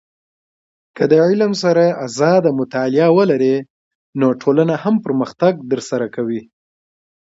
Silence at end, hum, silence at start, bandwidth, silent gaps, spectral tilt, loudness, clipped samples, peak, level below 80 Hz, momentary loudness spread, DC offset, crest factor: 0.85 s; none; 0.95 s; 8 kHz; 3.70-4.13 s; -6.5 dB/octave; -16 LUFS; under 0.1%; 0 dBFS; -64 dBFS; 9 LU; under 0.1%; 16 dB